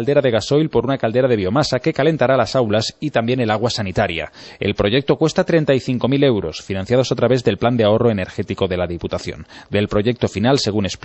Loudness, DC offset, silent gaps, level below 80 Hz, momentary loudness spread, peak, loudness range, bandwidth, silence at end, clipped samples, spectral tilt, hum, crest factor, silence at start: -18 LUFS; under 0.1%; none; -44 dBFS; 8 LU; -2 dBFS; 2 LU; 8.4 kHz; 0.1 s; under 0.1%; -6 dB/octave; none; 16 dB; 0 s